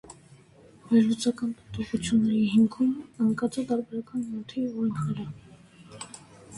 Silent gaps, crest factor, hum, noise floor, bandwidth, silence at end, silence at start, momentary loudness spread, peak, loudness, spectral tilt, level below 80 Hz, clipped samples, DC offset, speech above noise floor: none; 18 dB; none; -54 dBFS; 11.5 kHz; 0 s; 0.1 s; 19 LU; -10 dBFS; -27 LUFS; -6 dB/octave; -60 dBFS; under 0.1%; under 0.1%; 28 dB